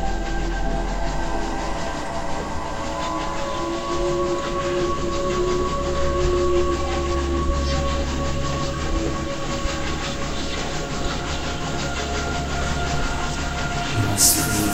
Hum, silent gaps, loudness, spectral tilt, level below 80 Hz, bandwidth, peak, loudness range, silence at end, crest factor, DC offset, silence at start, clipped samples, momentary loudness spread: none; none; -24 LUFS; -4 dB/octave; -28 dBFS; 16 kHz; -2 dBFS; 4 LU; 0 s; 20 dB; 0.2%; 0 s; under 0.1%; 6 LU